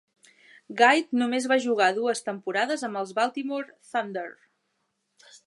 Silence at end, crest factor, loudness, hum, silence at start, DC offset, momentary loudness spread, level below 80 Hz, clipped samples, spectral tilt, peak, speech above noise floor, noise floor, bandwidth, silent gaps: 1.15 s; 22 dB; -25 LUFS; none; 0.7 s; under 0.1%; 14 LU; -84 dBFS; under 0.1%; -3 dB/octave; -4 dBFS; 51 dB; -76 dBFS; 11.5 kHz; none